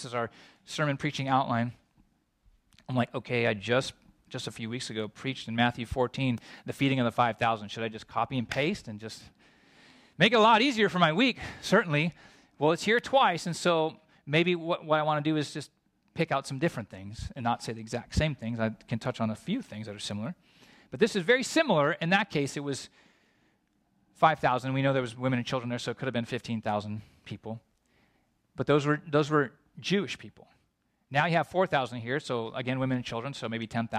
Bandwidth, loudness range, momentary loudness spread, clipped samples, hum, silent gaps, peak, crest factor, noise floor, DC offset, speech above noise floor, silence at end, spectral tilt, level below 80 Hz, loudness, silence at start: 14.5 kHz; 7 LU; 15 LU; under 0.1%; none; none; -8 dBFS; 22 dB; -74 dBFS; under 0.1%; 45 dB; 0 s; -5.5 dB/octave; -56 dBFS; -29 LUFS; 0 s